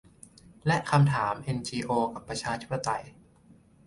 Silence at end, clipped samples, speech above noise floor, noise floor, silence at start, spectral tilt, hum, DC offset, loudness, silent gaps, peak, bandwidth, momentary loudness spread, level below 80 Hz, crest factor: 0.75 s; under 0.1%; 30 dB; -58 dBFS; 0.65 s; -6 dB/octave; none; under 0.1%; -29 LUFS; none; -10 dBFS; 11.5 kHz; 10 LU; -58 dBFS; 20 dB